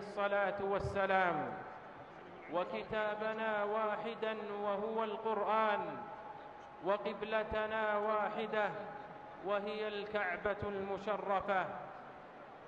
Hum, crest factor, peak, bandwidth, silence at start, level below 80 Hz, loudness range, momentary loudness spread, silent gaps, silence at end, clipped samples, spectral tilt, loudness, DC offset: none; 18 dB; -20 dBFS; 8.4 kHz; 0 s; -64 dBFS; 2 LU; 16 LU; none; 0 s; under 0.1%; -6.5 dB/octave; -37 LUFS; under 0.1%